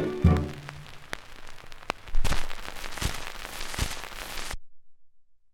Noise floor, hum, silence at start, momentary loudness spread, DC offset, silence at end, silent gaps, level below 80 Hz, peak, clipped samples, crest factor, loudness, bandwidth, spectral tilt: -51 dBFS; none; 0 s; 19 LU; under 0.1%; 0.2 s; none; -34 dBFS; -6 dBFS; under 0.1%; 22 dB; -32 LUFS; 16.5 kHz; -5 dB/octave